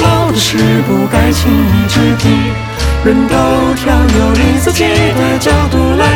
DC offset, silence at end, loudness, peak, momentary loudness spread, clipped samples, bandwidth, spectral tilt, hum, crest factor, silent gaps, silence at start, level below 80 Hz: under 0.1%; 0 s; -10 LUFS; 0 dBFS; 2 LU; under 0.1%; 18 kHz; -5.5 dB/octave; none; 10 dB; none; 0 s; -20 dBFS